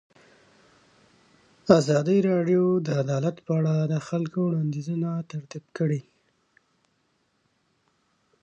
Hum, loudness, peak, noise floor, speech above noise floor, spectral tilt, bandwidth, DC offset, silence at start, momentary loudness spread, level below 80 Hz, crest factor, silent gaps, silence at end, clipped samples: none; -25 LUFS; -2 dBFS; -71 dBFS; 47 dB; -7.5 dB/octave; 8.8 kHz; under 0.1%; 1.65 s; 12 LU; -70 dBFS; 26 dB; none; 2.4 s; under 0.1%